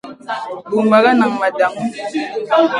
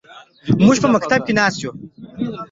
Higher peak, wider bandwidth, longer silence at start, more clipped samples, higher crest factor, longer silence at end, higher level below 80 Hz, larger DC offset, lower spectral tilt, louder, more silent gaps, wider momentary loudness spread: about the same, 0 dBFS vs -2 dBFS; first, 11.5 kHz vs 7.8 kHz; about the same, 0.05 s vs 0.1 s; neither; about the same, 16 dB vs 16 dB; about the same, 0 s vs 0.05 s; second, -64 dBFS vs -50 dBFS; neither; about the same, -5.5 dB/octave vs -5.5 dB/octave; about the same, -16 LUFS vs -16 LUFS; neither; second, 14 LU vs 20 LU